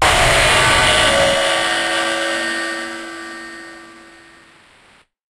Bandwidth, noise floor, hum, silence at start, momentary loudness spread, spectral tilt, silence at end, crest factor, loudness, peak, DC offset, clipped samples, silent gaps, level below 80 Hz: 16 kHz; -51 dBFS; none; 0 s; 19 LU; -2 dB/octave; 1.3 s; 16 dB; -14 LUFS; 0 dBFS; under 0.1%; under 0.1%; none; -34 dBFS